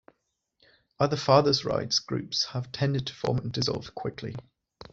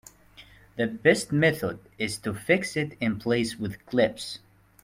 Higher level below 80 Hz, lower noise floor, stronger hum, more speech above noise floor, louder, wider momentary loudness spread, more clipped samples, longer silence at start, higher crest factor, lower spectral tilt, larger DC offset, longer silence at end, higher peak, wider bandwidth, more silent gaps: about the same, -58 dBFS vs -60 dBFS; first, -76 dBFS vs -53 dBFS; neither; first, 49 dB vs 26 dB; about the same, -27 LUFS vs -26 LUFS; about the same, 14 LU vs 13 LU; neither; first, 1 s vs 0.4 s; about the same, 22 dB vs 22 dB; about the same, -5 dB/octave vs -5 dB/octave; neither; second, 0.1 s vs 0.45 s; about the same, -6 dBFS vs -6 dBFS; second, 7.8 kHz vs 16.5 kHz; neither